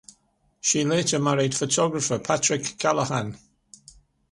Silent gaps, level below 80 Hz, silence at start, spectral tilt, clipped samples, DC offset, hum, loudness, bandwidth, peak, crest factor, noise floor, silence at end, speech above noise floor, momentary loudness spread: none; -60 dBFS; 0.65 s; -3.5 dB/octave; under 0.1%; under 0.1%; none; -23 LUFS; 11.5 kHz; -6 dBFS; 20 dB; -66 dBFS; 0.95 s; 42 dB; 5 LU